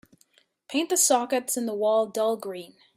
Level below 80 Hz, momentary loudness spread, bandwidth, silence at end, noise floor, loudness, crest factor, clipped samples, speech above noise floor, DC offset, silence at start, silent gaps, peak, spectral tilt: -80 dBFS; 12 LU; 16 kHz; 0.3 s; -64 dBFS; -24 LUFS; 18 dB; under 0.1%; 39 dB; under 0.1%; 0.7 s; none; -8 dBFS; -1.5 dB/octave